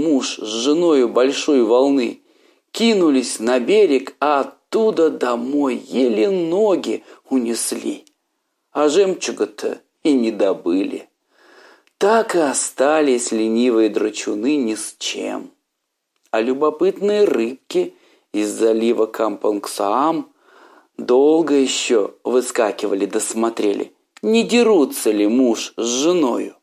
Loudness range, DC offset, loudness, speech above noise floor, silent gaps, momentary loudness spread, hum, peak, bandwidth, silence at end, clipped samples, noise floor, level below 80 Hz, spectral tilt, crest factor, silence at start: 4 LU; under 0.1%; -18 LUFS; 58 dB; none; 9 LU; none; -4 dBFS; 15 kHz; 0.1 s; under 0.1%; -76 dBFS; -76 dBFS; -3.5 dB/octave; 14 dB; 0 s